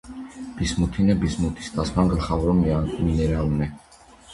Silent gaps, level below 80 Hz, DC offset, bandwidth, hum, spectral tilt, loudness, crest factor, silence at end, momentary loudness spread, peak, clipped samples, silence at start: none; -32 dBFS; under 0.1%; 11.5 kHz; none; -7 dB/octave; -23 LUFS; 18 dB; 0 s; 9 LU; -4 dBFS; under 0.1%; 0.05 s